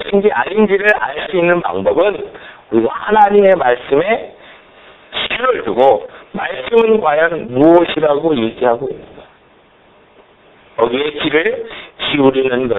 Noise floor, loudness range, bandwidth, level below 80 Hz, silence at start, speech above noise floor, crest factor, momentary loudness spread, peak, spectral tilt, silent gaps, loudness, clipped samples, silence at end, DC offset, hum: -48 dBFS; 6 LU; 4.1 kHz; -50 dBFS; 0 s; 35 dB; 14 dB; 13 LU; 0 dBFS; -7.5 dB/octave; none; -14 LUFS; under 0.1%; 0 s; under 0.1%; none